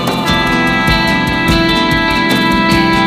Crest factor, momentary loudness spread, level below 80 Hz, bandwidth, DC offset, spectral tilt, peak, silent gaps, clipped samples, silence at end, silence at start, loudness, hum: 12 dB; 2 LU; -26 dBFS; 15.5 kHz; under 0.1%; -5 dB/octave; 0 dBFS; none; under 0.1%; 0 s; 0 s; -11 LUFS; none